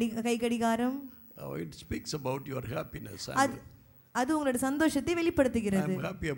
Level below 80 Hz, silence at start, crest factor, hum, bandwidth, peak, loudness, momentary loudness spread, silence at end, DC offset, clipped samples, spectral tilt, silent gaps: -56 dBFS; 0 s; 20 dB; none; 17 kHz; -12 dBFS; -31 LUFS; 13 LU; 0 s; under 0.1%; under 0.1%; -5 dB/octave; none